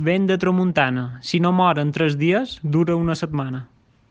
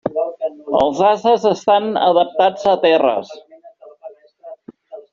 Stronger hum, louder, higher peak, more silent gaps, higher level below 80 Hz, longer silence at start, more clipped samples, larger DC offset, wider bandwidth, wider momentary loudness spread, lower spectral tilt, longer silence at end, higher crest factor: neither; second, -20 LUFS vs -16 LUFS; about the same, -4 dBFS vs -2 dBFS; neither; about the same, -52 dBFS vs -56 dBFS; about the same, 0 s vs 0.05 s; neither; neither; first, 8.2 kHz vs 7.4 kHz; about the same, 8 LU vs 9 LU; first, -7 dB/octave vs -3 dB/octave; first, 0.45 s vs 0.1 s; about the same, 16 dB vs 16 dB